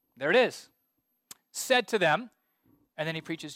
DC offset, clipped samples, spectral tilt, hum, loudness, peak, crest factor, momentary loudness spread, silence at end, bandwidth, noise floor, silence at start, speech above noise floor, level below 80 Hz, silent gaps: under 0.1%; under 0.1%; -3.5 dB/octave; none; -27 LUFS; -12 dBFS; 20 dB; 21 LU; 0 s; 16.5 kHz; -77 dBFS; 0.2 s; 50 dB; -78 dBFS; none